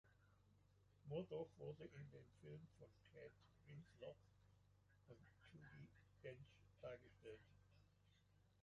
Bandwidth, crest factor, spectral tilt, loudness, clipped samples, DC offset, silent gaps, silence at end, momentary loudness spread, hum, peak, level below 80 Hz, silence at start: 7.2 kHz; 22 dB; -6.5 dB/octave; -60 LUFS; under 0.1%; under 0.1%; none; 0 s; 15 LU; none; -38 dBFS; -80 dBFS; 0.05 s